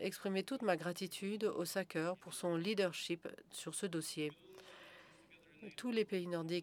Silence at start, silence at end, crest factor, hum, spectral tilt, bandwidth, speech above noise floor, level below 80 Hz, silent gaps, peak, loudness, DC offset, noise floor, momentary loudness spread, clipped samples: 0 s; 0 s; 22 dB; none; -4.5 dB/octave; 19 kHz; 24 dB; -86 dBFS; none; -20 dBFS; -40 LUFS; under 0.1%; -64 dBFS; 18 LU; under 0.1%